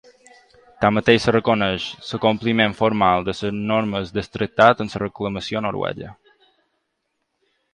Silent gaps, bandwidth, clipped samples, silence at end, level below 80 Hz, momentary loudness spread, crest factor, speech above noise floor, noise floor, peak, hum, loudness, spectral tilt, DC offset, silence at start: none; 10 kHz; under 0.1%; 1.6 s; -50 dBFS; 11 LU; 20 dB; 55 dB; -74 dBFS; 0 dBFS; none; -20 LUFS; -6 dB/octave; under 0.1%; 0.8 s